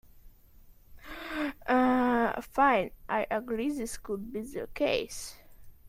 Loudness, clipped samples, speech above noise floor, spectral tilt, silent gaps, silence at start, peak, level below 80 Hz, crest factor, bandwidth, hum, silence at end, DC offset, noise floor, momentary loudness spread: -30 LUFS; under 0.1%; 25 dB; -4 dB/octave; none; 0.15 s; -12 dBFS; -54 dBFS; 18 dB; 16 kHz; none; 0.15 s; under 0.1%; -55 dBFS; 14 LU